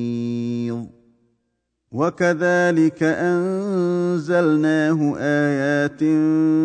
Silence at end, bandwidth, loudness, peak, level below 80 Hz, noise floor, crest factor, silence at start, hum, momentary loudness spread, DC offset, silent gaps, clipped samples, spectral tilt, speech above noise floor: 0 s; 9.2 kHz; -19 LUFS; -6 dBFS; -64 dBFS; -74 dBFS; 14 dB; 0 s; none; 7 LU; under 0.1%; none; under 0.1%; -7 dB/octave; 55 dB